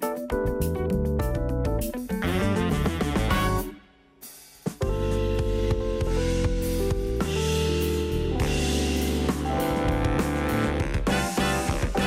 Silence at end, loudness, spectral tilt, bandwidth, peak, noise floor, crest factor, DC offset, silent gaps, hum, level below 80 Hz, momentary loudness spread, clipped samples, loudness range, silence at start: 0 s; -26 LUFS; -5.5 dB/octave; 16 kHz; -12 dBFS; -51 dBFS; 12 dB; under 0.1%; none; none; -32 dBFS; 4 LU; under 0.1%; 2 LU; 0 s